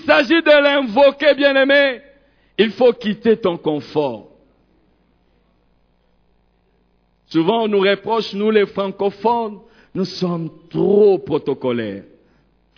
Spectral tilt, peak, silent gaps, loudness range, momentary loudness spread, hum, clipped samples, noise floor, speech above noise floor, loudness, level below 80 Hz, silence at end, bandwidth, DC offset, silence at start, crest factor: -6.5 dB/octave; -2 dBFS; none; 11 LU; 13 LU; none; under 0.1%; -60 dBFS; 44 dB; -16 LUFS; -58 dBFS; 0.75 s; 5.4 kHz; under 0.1%; 0.05 s; 16 dB